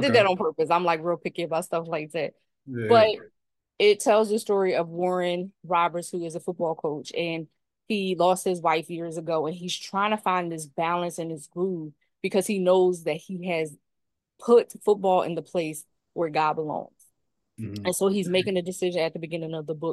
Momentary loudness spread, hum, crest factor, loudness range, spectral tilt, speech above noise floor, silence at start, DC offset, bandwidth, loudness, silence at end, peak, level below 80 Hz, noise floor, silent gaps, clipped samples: 13 LU; none; 20 dB; 5 LU; -5 dB/octave; 57 dB; 0 s; under 0.1%; 12.5 kHz; -26 LUFS; 0 s; -6 dBFS; -74 dBFS; -82 dBFS; none; under 0.1%